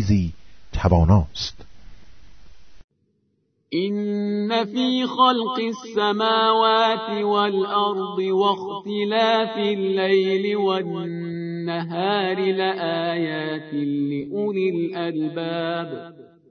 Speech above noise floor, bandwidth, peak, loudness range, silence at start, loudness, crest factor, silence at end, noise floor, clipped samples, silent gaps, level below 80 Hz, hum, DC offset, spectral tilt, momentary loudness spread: 47 dB; 6.6 kHz; -4 dBFS; 6 LU; 0 s; -22 LUFS; 20 dB; 0.25 s; -68 dBFS; under 0.1%; 2.84-2.88 s; -40 dBFS; none; under 0.1%; -6.5 dB/octave; 10 LU